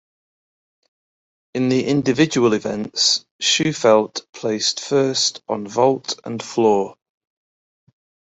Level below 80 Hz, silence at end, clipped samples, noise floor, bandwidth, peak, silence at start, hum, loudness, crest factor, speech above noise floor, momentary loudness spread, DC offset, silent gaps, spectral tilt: -62 dBFS; 1.35 s; under 0.1%; under -90 dBFS; 8.4 kHz; -2 dBFS; 1.55 s; none; -19 LUFS; 18 dB; over 71 dB; 11 LU; under 0.1%; 3.31-3.39 s; -3.5 dB/octave